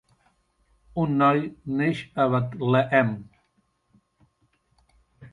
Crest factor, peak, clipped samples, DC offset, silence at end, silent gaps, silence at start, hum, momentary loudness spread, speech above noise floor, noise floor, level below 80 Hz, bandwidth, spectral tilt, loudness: 20 dB; -6 dBFS; under 0.1%; under 0.1%; 0.05 s; none; 0.95 s; none; 9 LU; 47 dB; -70 dBFS; -60 dBFS; 11 kHz; -8.5 dB/octave; -24 LUFS